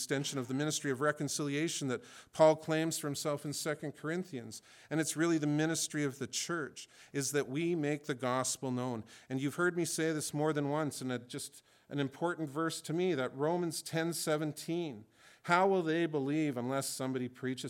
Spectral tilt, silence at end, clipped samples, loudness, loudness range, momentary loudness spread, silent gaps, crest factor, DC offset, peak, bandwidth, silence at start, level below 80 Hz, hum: -4.5 dB/octave; 0 s; under 0.1%; -35 LUFS; 3 LU; 10 LU; none; 22 dB; under 0.1%; -12 dBFS; 17.5 kHz; 0 s; -82 dBFS; none